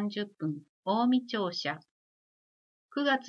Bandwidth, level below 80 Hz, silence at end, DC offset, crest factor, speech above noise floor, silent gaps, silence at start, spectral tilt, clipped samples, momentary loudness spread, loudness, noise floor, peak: 7 kHz; -88 dBFS; 0 s; under 0.1%; 16 dB; over 59 dB; 0.69-0.83 s, 1.91-2.89 s; 0 s; -5.5 dB/octave; under 0.1%; 11 LU; -32 LUFS; under -90 dBFS; -16 dBFS